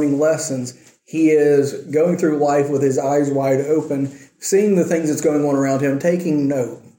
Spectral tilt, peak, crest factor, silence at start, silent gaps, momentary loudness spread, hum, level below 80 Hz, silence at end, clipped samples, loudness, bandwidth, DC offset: -6.5 dB/octave; -4 dBFS; 14 dB; 0 s; none; 8 LU; none; -64 dBFS; 0.2 s; under 0.1%; -18 LUFS; 17 kHz; under 0.1%